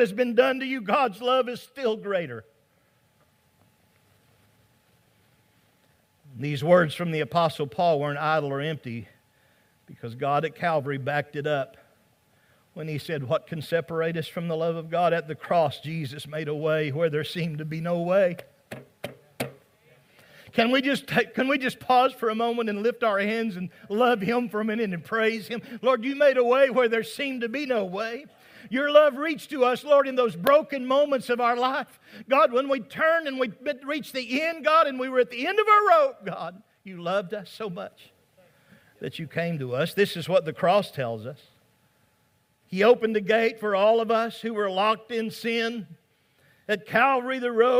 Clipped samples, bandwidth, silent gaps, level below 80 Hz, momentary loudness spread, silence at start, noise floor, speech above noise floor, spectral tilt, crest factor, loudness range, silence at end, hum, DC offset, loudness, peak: under 0.1%; 16 kHz; none; -72 dBFS; 15 LU; 0 s; -67 dBFS; 42 dB; -6 dB/octave; 22 dB; 7 LU; 0 s; none; under 0.1%; -25 LUFS; -4 dBFS